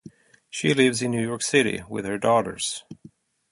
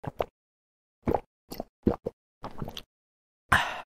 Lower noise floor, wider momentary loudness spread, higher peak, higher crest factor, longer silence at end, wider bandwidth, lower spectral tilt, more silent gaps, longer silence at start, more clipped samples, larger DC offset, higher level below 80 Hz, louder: second, -52 dBFS vs under -90 dBFS; second, 10 LU vs 19 LU; about the same, -4 dBFS vs -6 dBFS; second, 20 dB vs 28 dB; first, 0.6 s vs 0 s; second, 11.5 kHz vs 16 kHz; about the same, -4 dB/octave vs -5 dB/octave; second, none vs 0.30-1.02 s, 1.26-1.48 s, 1.69-1.83 s, 2.13-2.41 s, 2.86-3.49 s; about the same, 0.05 s vs 0.05 s; neither; neither; second, -60 dBFS vs -48 dBFS; first, -23 LUFS vs -32 LUFS